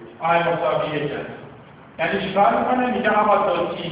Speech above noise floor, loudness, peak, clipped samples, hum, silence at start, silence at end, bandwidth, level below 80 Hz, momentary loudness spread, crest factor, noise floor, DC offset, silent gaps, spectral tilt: 23 dB; -20 LUFS; -4 dBFS; under 0.1%; none; 0 s; 0 s; 4 kHz; -54 dBFS; 10 LU; 16 dB; -43 dBFS; under 0.1%; none; -9.5 dB/octave